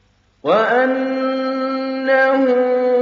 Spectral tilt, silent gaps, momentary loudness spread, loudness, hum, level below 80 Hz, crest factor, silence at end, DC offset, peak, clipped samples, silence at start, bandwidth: -2.5 dB/octave; none; 7 LU; -17 LUFS; none; -68 dBFS; 14 dB; 0 s; under 0.1%; -4 dBFS; under 0.1%; 0.45 s; 6.8 kHz